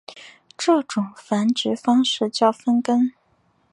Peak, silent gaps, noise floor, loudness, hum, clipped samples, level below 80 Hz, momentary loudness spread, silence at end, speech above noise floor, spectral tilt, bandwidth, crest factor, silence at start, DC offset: -4 dBFS; none; -63 dBFS; -21 LUFS; none; under 0.1%; -72 dBFS; 7 LU; 0.65 s; 43 dB; -4.5 dB/octave; 11 kHz; 18 dB; 0.1 s; under 0.1%